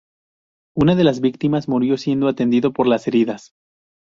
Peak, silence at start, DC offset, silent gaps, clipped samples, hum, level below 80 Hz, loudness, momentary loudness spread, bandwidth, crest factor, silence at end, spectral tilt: -2 dBFS; 0.75 s; under 0.1%; none; under 0.1%; none; -52 dBFS; -18 LUFS; 6 LU; 7.6 kHz; 16 dB; 0.75 s; -7.5 dB/octave